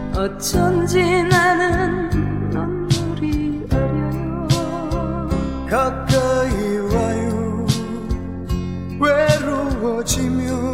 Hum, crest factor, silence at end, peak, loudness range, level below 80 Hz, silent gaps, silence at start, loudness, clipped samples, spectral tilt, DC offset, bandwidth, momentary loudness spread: none; 18 dB; 0 s; -2 dBFS; 3 LU; -30 dBFS; none; 0 s; -19 LUFS; under 0.1%; -5.5 dB/octave; under 0.1%; 16.5 kHz; 7 LU